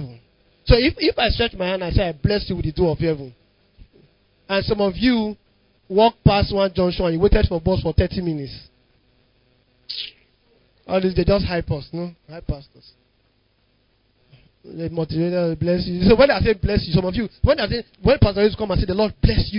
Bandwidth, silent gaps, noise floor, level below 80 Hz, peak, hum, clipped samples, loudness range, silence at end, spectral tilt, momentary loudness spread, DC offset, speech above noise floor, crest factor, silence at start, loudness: 5.4 kHz; none; -63 dBFS; -30 dBFS; 0 dBFS; none; under 0.1%; 10 LU; 0 s; -11 dB/octave; 15 LU; under 0.1%; 44 dB; 20 dB; 0 s; -20 LUFS